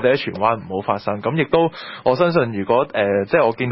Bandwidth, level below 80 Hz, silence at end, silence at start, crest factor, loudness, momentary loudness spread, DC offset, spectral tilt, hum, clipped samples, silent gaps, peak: 5.8 kHz; -54 dBFS; 0 s; 0 s; 16 dB; -19 LUFS; 6 LU; under 0.1%; -11 dB/octave; none; under 0.1%; none; -2 dBFS